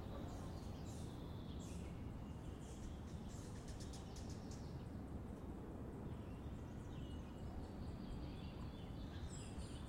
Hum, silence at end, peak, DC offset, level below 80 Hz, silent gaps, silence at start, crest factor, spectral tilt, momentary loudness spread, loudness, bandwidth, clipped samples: none; 0 s; -38 dBFS; under 0.1%; -56 dBFS; none; 0 s; 12 dB; -6.5 dB/octave; 1 LU; -52 LUFS; 16 kHz; under 0.1%